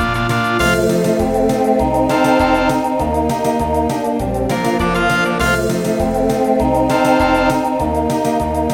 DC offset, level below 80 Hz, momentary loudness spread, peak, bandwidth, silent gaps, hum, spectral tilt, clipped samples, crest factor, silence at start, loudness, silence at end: under 0.1%; -30 dBFS; 4 LU; 0 dBFS; 18 kHz; none; none; -5.5 dB/octave; under 0.1%; 14 dB; 0 s; -15 LUFS; 0 s